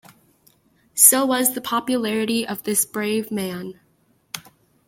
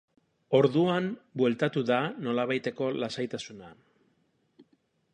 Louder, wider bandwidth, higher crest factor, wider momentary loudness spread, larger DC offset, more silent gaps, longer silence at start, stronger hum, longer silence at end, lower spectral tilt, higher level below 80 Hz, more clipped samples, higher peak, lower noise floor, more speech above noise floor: first, -19 LUFS vs -28 LUFS; first, 16.5 kHz vs 10 kHz; about the same, 22 dB vs 20 dB; first, 23 LU vs 11 LU; neither; neither; first, 0.95 s vs 0.5 s; neither; about the same, 0.5 s vs 0.5 s; second, -2 dB/octave vs -6.5 dB/octave; first, -66 dBFS vs -74 dBFS; neither; first, 0 dBFS vs -10 dBFS; second, -62 dBFS vs -71 dBFS; about the same, 40 dB vs 43 dB